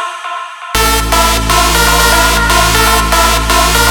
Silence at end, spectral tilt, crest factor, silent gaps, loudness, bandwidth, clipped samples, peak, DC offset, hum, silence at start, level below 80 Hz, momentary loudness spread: 0 s; -2.5 dB/octave; 10 dB; none; -9 LUFS; 19.5 kHz; 0.1%; 0 dBFS; under 0.1%; none; 0 s; -18 dBFS; 10 LU